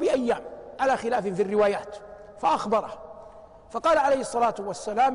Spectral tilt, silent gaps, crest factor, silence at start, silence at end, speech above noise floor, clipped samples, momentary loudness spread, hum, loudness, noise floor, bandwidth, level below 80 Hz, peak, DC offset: -4.5 dB/octave; none; 14 dB; 0 s; 0 s; 23 dB; under 0.1%; 19 LU; none; -25 LUFS; -47 dBFS; 10.5 kHz; -58 dBFS; -12 dBFS; under 0.1%